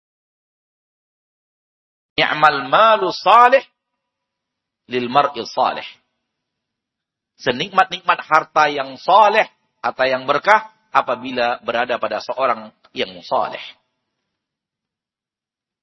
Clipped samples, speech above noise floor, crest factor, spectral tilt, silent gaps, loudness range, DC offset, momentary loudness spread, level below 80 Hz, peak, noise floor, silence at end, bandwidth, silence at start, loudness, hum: under 0.1%; 72 dB; 20 dB; -4 dB/octave; none; 8 LU; under 0.1%; 13 LU; -64 dBFS; 0 dBFS; -89 dBFS; 2.1 s; 8.8 kHz; 2.2 s; -17 LUFS; none